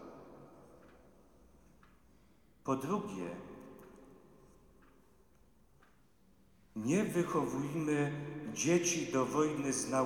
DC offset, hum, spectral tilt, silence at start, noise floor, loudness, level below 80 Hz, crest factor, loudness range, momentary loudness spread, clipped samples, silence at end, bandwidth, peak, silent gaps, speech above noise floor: under 0.1%; none; -5 dB/octave; 0 s; -68 dBFS; -35 LUFS; -70 dBFS; 20 dB; 14 LU; 23 LU; under 0.1%; 0 s; 18 kHz; -18 dBFS; none; 34 dB